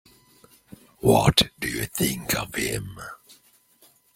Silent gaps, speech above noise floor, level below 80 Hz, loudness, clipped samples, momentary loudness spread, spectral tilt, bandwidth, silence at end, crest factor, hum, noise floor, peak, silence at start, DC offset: none; 36 dB; -46 dBFS; -23 LUFS; under 0.1%; 18 LU; -4 dB/octave; 16.5 kHz; 1 s; 24 dB; none; -59 dBFS; -2 dBFS; 1.05 s; under 0.1%